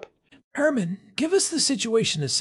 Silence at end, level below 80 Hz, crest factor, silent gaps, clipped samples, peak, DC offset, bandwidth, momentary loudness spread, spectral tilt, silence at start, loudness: 0 s; -68 dBFS; 16 dB; 0.44-0.51 s; under 0.1%; -10 dBFS; under 0.1%; 13.5 kHz; 8 LU; -3 dB/octave; 0 s; -23 LUFS